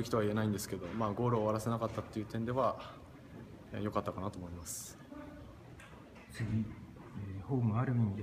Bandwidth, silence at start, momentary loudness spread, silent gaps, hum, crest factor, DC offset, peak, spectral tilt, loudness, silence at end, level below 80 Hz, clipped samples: 15.5 kHz; 0 s; 20 LU; none; none; 18 dB; under 0.1%; -18 dBFS; -6.5 dB/octave; -37 LUFS; 0 s; -60 dBFS; under 0.1%